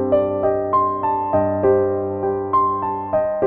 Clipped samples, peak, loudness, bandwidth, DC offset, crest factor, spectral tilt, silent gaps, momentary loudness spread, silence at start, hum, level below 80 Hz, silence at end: under 0.1%; -6 dBFS; -19 LUFS; 3.4 kHz; under 0.1%; 14 dB; -12 dB/octave; none; 5 LU; 0 s; none; -50 dBFS; 0 s